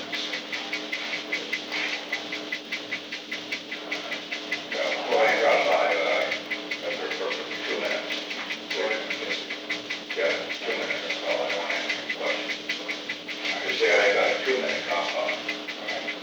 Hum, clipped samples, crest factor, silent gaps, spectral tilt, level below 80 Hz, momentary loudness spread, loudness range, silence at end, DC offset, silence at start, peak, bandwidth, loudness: none; under 0.1%; 18 dB; none; -1.5 dB/octave; -82 dBFS; 10 LU; 5 LU; 0 s; under 0.1%; 0 s; -10 dBFS; over 20 kHz; -27 LUFS